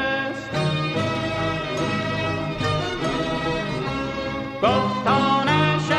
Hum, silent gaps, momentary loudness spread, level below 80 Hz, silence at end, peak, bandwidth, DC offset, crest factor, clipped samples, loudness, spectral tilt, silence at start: none; none; 7 LU; -44 dBFS; 0 s; -6 dBFS; 11 kHz; under 0.1%; 16 dB; under 0.1%; -23 LUFS; -5.5 dB/octave; 0 s